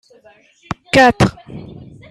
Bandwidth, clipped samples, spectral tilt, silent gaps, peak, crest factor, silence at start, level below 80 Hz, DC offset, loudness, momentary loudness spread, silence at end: 14 kHz; under 0.1%; -5.5 dB/octave; none; 0 dBFS; 16 dB; 0.7 s; -40 dBFS; under 0.1%; -13 LUFS; 24 LU; 0.5 s